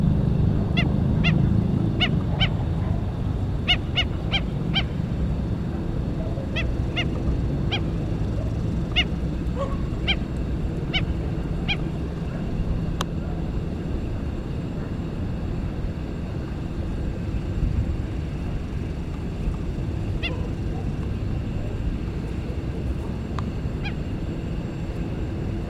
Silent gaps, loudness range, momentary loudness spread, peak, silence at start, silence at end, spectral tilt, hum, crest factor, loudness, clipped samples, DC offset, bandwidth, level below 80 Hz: none; 6 LU; 8 LU; -6 dBFS; 0 s; 0 s; -7 dB/octave; none; 20 dB; -26 LUFS; under 0.1%; under 0.1%; 10.5 kHz; -30 dBFS